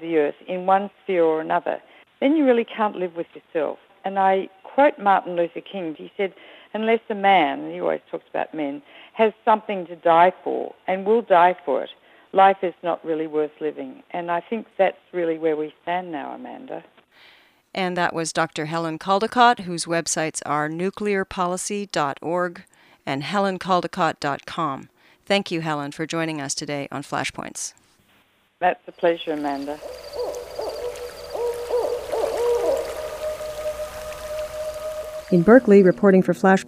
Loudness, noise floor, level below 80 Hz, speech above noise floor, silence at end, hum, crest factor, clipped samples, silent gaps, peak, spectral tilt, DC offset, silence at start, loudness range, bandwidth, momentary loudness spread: -22 LUFS; -61 dBFS; -56 dBFS; 39 dB; 0 s; none; 22 dB; under 0.1%; none; 0 dBFS; -5 dB/octave; under 0.1%; 0 s; 7 LU; 15.5 kHz; 14 LU